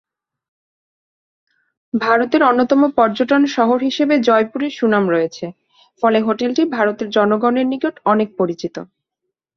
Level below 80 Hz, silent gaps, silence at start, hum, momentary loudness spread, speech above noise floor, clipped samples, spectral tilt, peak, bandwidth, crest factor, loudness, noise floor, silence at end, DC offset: -62 dBFS; none; 1.95 s; none; 8 LU; 63 dB; under 0.1%; -6 dB/octave; -2 dBFS; 6.8 kHz; 16 dB; -16 LUFS; -79 dBFS; 0.7 s; under 0.1%